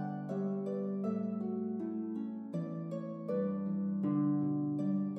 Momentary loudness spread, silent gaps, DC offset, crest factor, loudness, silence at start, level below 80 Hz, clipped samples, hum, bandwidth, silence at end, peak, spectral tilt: 7 LU; none; under 0.1%; 12 dB; -36 LUFS; 0 s; -88 dBFS; under 0.1%; none; 3.7 kHz; 0 s; -22 dBFS; -11 dB/octave